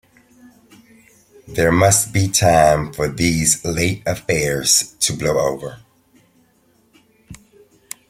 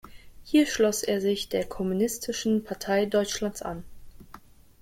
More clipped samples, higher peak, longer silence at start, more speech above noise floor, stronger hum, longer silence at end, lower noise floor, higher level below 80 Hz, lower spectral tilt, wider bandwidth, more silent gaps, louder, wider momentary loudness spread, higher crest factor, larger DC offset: neither; first, 0 dBFS vs -10 dBFS; first, 1.45 s vs 0.05 s; first, 41 dB vs 24 dB; neither; first, 0.75 s vs 0.4 s; first, -58 dBFS vs -50 dBFS; first, -42 dBFS vs -52 dBFS; about the same, -3.5 dB/octave vs -4 dB/octave; about the same, 16.5 kHz vs 16.5 kHz; neither; first, -16 LUFS vs -27 LUFS; first, 11 LU vs 8 LU; about the same, 18 dB vs 18 dB; neither